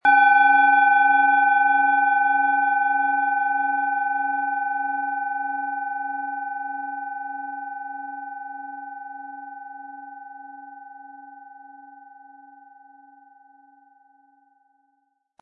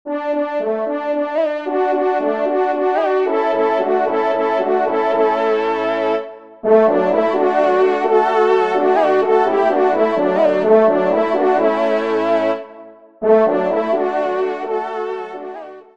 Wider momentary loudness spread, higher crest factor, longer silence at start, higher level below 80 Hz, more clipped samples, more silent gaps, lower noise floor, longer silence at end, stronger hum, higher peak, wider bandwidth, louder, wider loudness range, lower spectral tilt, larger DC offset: first, 24 LU vs 8 LU; about the same, 18 dB vs 14 dB; about the same, 0.05 s vs 0.05 s; second, -78 dBFS vs -68 dBFS; neither; neither; first, -71 dBFS vs -40 dBFS; first, 3.4 s vs 0.15 s; neither; second, -6 dBFS vs -2 dBFS; second, 4.7 kHz vs 7.4 kHz; second, -20 LUFS vs -16 LUFS; first, 23 LU vs 4 LU; second, -3.5 dB/octave vs -6.5 dB/octave; second, under 0.1% vs 0.4%